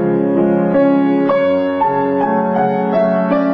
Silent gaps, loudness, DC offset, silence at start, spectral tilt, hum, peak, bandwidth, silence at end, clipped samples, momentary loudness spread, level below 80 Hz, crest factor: none; -14 LUFS; under 0.1%; 0 s; -10 dB/octave; none; -2 dBFS; 5.2 kHz; 0 s; under 0.1%; 3 LU; -54 dBFS; 12 dB